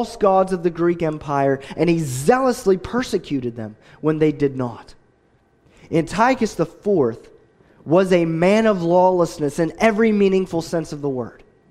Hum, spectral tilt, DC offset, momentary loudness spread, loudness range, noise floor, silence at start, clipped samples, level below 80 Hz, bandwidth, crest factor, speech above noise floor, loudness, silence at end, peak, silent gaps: none; -6.5 dB/octave; under 0.1%; 10 LU; 5 LU; -59 dBFS; 0 s; under 0.1%; -48 dBFS; 15 kHz; 18 dB; 40 dB; -19 LUFS; 0.4 s; -2 dBFS; none